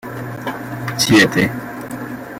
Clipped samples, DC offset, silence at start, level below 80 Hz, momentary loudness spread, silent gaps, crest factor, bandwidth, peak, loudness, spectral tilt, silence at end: under 0.1%; under 0.1%; 0.05 s; -48 dBFS; 17 LU; none; 18 dB; 16.5 kHz; -2 dBFS; -16 LUFS; -4 dB/octave; 0 s